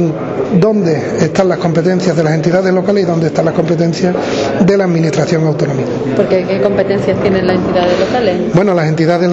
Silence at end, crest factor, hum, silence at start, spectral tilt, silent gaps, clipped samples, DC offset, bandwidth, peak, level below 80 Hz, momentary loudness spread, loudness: 0 s; 12 dB; none; 0 s; -7 dB/octave; none; under 0.1%; under 0.1%; 8 kHz; 0 dBFS; -42 dBFS; 3 LU; -12 LUFS